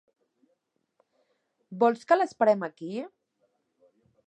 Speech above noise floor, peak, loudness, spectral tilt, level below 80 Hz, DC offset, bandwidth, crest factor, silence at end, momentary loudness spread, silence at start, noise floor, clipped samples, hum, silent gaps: 51 dB; -8 dBFS; -26 LUFS; -6 dB/octave; -86 dBFS; under 0.1%; 8.8 kHz; 22 dB; 1.2 s; 18 LU; 1.7 s; -76 dBFS; under 0.1%; none; none